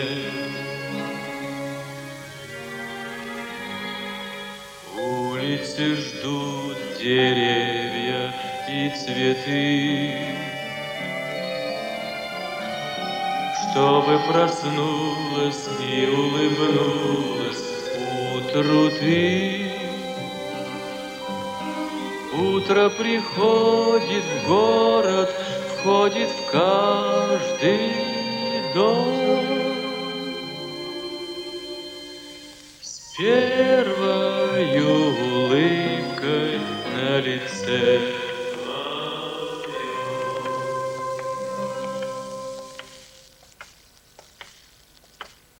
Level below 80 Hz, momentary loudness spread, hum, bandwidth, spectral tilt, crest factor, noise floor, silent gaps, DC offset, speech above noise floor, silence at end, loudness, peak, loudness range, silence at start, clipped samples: -62 dBFS; 13 LU; none; 17 kHz; -5 dB/octave; 18 dB; -54 dBFS; none; under 0.1%; 33 dB; 0.35 s; -23 LUFS; -6 dBFS; 11 LU; 0 s; under 0.1%